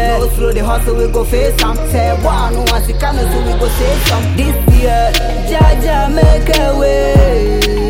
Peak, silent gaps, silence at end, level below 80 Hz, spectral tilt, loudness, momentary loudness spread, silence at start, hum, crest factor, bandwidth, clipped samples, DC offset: 0 dBFS; none; 0 s; -14 dBFS; -5.5 dB/octave; -13 LUFS; 5 LU; 0 s; none; 10 dB; 17 kHz; under 0.1%; under 0.1%